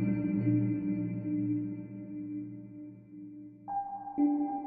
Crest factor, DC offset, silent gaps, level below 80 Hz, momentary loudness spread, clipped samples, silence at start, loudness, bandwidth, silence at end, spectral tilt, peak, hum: 16 dB; under 0.1%; none; -66 dBFS; 19 LU; under 0.1%; 0 s; -33 LUFS; 2.8 kHz; 0 s; -11.5 dB/octave; -18 dBFS; none